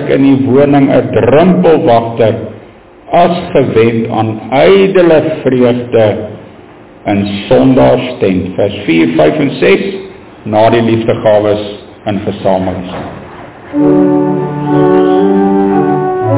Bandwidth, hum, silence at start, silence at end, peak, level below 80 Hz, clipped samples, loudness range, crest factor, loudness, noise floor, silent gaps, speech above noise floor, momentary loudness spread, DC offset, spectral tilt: 4 kHz; none; 0 s; 0 s; 0 dBFS; -38 dBFS; 0.3%; 3 LU; 10 dB; -9 LUFS; -35 dBFS; none; 27 dB; 13 LU; under 0.1%; -11.5 dB/octave